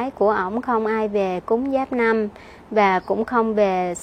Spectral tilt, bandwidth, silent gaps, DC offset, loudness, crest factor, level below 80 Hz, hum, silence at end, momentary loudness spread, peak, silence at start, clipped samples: -6 dB/octave; 9.4 kHz; none; under 0.1%; -21 LUFS; 16 dB; -52 dBFS; none; 0 s; 4 LU; -4 dBFS; 0 s; under 0.1%